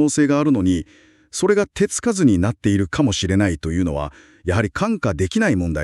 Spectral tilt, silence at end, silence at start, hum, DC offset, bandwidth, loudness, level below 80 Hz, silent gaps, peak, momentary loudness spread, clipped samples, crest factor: -5.5 dB/octave; 0 s; 0 s; none; under 0.1%; 12 kHz; -19 LUFS; -38 dBFS; none; -4 dBFS; 8 LU; under 0.1%; 14 dB